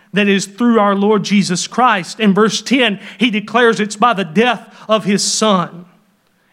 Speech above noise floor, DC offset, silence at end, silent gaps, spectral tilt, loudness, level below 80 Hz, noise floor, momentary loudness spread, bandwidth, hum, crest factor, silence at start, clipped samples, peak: 43 dB; under 0.1%; 0.7 s; none; -4 dB/octave; -14 LUFS; -66 dBFS; -57 dBFS; 5 LU; 13.5 kHz; none; 14 dB; 0.15 s; under 0.1%; 0 dBFS